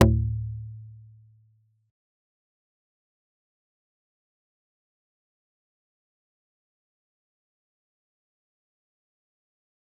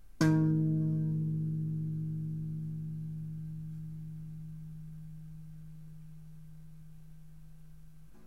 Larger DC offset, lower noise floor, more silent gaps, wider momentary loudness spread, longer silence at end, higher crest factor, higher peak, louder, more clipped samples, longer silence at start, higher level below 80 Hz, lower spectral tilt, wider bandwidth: second, under 0.1% vs 0.3%; first, -65 dBFS vs -56 dBFS; neither; about the same, 24 LU vs 25 LU; first, 9.05 s vs 0 s; first, 32 dB vs 22 dB; first, -2 dBFS vs -14 dBFS; first, -27 LUFS vs -35 LUFS; neither; about the same, 0 s vs 0.1 s; first, -42 dBFS vs -60 dBFS; second, -6.5 dB/octave vs -8 dB/octave; second, 0.6 kHz vs 10 kHz